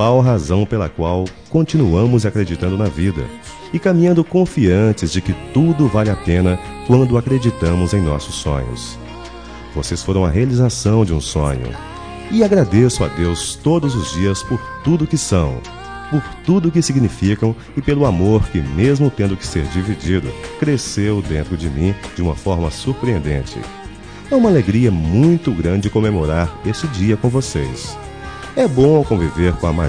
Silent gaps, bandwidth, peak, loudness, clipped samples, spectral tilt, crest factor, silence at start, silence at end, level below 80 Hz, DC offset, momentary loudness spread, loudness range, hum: none; 10.5 kHz; -2 dBFS; -16 LUFS; under 0.1%; -6.5 dB/octave; 14 dB; 0 s; 0 s; -30 dBFS; 0.4%; 13 LU; 4 LU; none